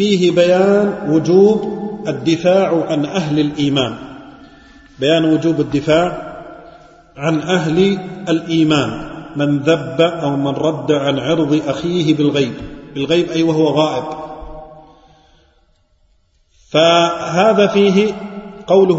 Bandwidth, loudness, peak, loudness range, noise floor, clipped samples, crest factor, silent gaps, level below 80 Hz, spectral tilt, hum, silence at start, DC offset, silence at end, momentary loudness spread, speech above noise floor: 8 kHz; -15 LUFS; 0 dBFS; 5 LU; -56 dBFS; under 0.1%; 16 dB; none; -46 dBFS; -6 dB/octave; none; 0 s; under 0.1%; 0 s; 16 LU; 42 dB